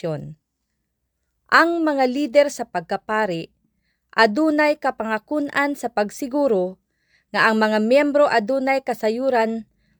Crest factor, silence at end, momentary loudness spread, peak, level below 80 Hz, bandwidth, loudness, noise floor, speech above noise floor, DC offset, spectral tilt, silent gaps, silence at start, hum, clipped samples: 20 dB; 0.35 s; 10 LU; 0 dBFS; -64 dBFS; over 20 kHz; -20 LUFS; -75 dBFS; 56 dB; under 0.1%; -5 dB/octave; none; 0.05 s; none; under 0.1%